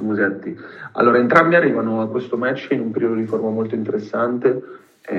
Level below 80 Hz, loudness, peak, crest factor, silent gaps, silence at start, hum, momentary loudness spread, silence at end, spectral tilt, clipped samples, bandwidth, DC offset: -70 dBFS; -18 LUFS; 0 dBFS; 18 dB; none; 0 s; none; 12 LU; 0 s; -8 dB/octave; under 0.1%; 7.6 kHz; under 0.1%